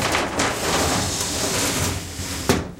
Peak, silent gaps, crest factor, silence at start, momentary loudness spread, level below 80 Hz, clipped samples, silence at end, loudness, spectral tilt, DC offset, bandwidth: -2 dBFS; none; 20 dB; 0 s; 6 LU; -38 dBFS; under 0.1%; 0 s; -22 LUFS; -3 dB/octave; under 0.1%; 16.5 kHz